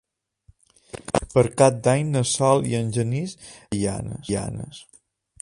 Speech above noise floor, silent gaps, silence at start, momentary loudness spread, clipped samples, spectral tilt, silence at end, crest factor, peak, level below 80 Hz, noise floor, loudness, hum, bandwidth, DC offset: 36 dB; none; 0.95 s; 20 LU; under 0.1%; -5.5 dB/octave; 0.6 s; 22 dB; -2 dBFS; -48 dBFS; -59 dBFS; -22 LUFS; none; 11.5 kHz; under 0.1%